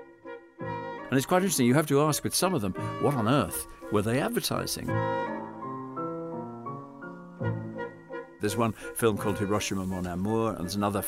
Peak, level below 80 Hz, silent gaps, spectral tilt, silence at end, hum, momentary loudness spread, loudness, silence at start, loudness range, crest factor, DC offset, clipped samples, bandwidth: -12 dBFS; -56 dBFS; none; -5 dB/octave; 0 s; none; 15 LU; -29 LUFS; 0 s; 8 LU; 18 dB; under 0.1%; under 0.1%; 16 kHz